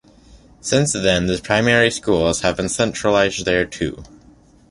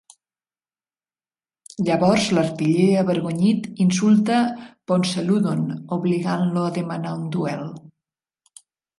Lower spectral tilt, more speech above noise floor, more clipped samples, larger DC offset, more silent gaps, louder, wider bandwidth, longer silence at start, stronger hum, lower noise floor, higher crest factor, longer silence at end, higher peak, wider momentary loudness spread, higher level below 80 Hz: second, -4 dB/octave vs -6.5 dB/octave; second, 31 dB vs over 70 dB; neither; neither; neither; first, -18 LUFS vs -21 LUFS; about the same, 11.5 kHz vs 11.5 kHz; second, 0.35 s vs 1.8 s; neither; second, -49 dBFS vs under -90 dBFS; about the same, 18 dB vs 18 dB; second, 0.65 s vs 1.2 s; first, 0 dBFS vs -4 dBFS; about the same, 9 LU vs 10 LU; first, -40 dBFS vs -62 dBFS